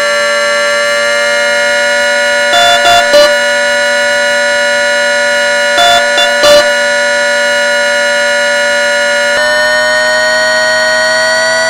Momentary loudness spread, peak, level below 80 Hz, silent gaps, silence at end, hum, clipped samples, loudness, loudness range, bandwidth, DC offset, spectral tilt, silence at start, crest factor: 3 LU; 0 dBFS; -46 dBFS; none; 0 s; none; 0.8%; -8 LUFS; 1 LU; 17 kHz; under 0.1%; 0 dB/octave; 0 s; 8 dB